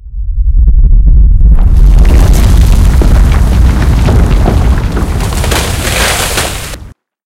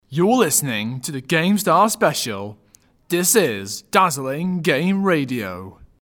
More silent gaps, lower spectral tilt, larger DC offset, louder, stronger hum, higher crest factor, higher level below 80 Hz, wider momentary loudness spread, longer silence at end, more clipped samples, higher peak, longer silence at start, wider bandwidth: neither; about the same, -5 dB/octave vs -4 dB/octave; neither; first, -9 LUFS vs -19 LUFS; neither; second, 6 dB vs 20 dB; first, -6 dBFS vs -58 dBFS; second, 6 LU vs 12 LU; about the same, 0.35 s vs 0.3 s; first, 7% vs under 0.1%; about the same, 0 dBFS vs 0 dBFS; about the same, 0.05 s vs 0.1 s; second, 16 kHz vs 19.5 kHz